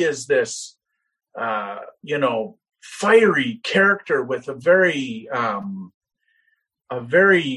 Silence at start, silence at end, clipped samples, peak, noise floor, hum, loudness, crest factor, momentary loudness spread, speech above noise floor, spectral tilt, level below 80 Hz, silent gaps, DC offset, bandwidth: 0 s; 0 s; under 0.1%; -2 dBFS; -68 dBFS; none; -19 LUFS; 18 dB; 18 LU; 48 dB; -4.5 dB/octave; -68 dBFS; 5.94-6.01 s; under 0.1%; 11.5 kHz